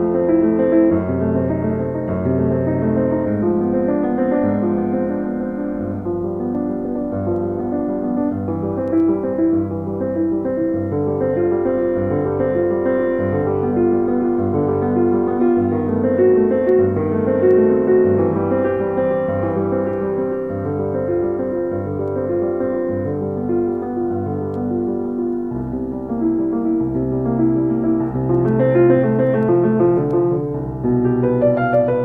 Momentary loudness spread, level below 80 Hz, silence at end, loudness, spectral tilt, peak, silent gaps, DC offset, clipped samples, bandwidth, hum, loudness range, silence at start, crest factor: 8 LU; -44 dBFS; 0 s; -18 LUFS; -12 dB/octave; -2 dBFS; none; 0.3%; under 0.1%; 3.6 kHz; none; 5 LU; 0 s; 16 dB